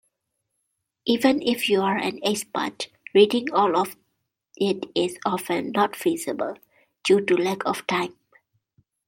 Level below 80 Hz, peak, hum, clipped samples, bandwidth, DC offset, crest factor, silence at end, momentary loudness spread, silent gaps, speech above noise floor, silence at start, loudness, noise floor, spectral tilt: -70 dBFS; -4 dBFS; none; under 0.1%; 16.5 kHz; under 0.1%; 20 dB; 0.95 s; 11 LU; none; 56 dB; 1.05 s; -23 LUFS; -78 dBFS; -4.5 dB/octave